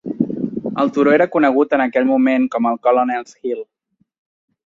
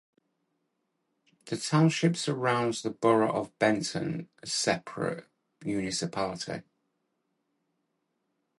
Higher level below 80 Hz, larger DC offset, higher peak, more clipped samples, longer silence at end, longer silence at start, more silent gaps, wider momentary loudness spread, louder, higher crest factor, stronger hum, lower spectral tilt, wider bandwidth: first, -62 dBFS vs -68 dBFS; neither; first, -2 dBFS vs -10 dBFS; neither; second, 1.05 s vs 2 s; second, 0.05 s vs 1.45 s; neither; about the same, 11 LU vs 13 LU; first, -17 LUFS vs -29 LUFS; about the same, 16 dB vs 20 dB; neither; first, -7 dB/octave vs -5 dB/octave; second, 7.4 kHz vs 11.5 kHz